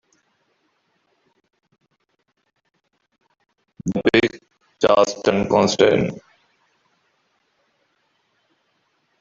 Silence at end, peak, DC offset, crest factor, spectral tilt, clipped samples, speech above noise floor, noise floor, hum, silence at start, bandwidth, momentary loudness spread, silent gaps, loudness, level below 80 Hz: 3.05 s; 0 dBFS; under 0.1%; 22 dB; -5 dB/octave; under 0.1%; 53 dB; -71 dBFS; none; 3.85 s; 7.6 kHz; 11 LU; none; -18 LUFS; -56 dBFS